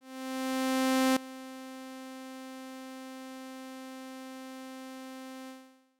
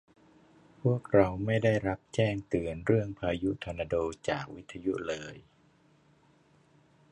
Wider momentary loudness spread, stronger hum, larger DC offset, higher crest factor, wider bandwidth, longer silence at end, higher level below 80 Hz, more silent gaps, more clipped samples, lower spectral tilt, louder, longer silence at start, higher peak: first, 16 LU vs 10 LU; neither; neither; about the same, 18 dB vs 22 dB; first, 17 kHz vs 10.5 kHz; second, 0.25 s vs 1.7 s; second, -80 dBFS vs -54 dBFS; neither; neither; second, -2 dB/octave vs -7 dB/octave; second, -36 LUFS vs -31 LUFS; second, 0 s vs 0.85 s; second, -18 dBFS vs -10 dBFS